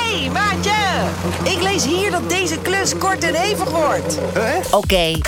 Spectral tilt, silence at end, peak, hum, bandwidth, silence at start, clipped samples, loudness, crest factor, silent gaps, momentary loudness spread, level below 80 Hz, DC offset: -3.5 dB/octave; 0 s; -2 dBFS; none; 17.5 kHz; 0 s; under 0.1%; -17 LUFS; 16 dB; none; 3 LU; -36 dBFS; under 0.1%